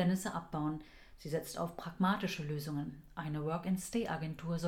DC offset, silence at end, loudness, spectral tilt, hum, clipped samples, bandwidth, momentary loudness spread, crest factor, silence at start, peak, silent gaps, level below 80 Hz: under 0.1%; 0 s; -38 LUFS; -6 dB/octave; none; under 0.1%; 17 kHz; 10 LU; 16 dB; 0 s; -20 dBFS; none; -60 dBFS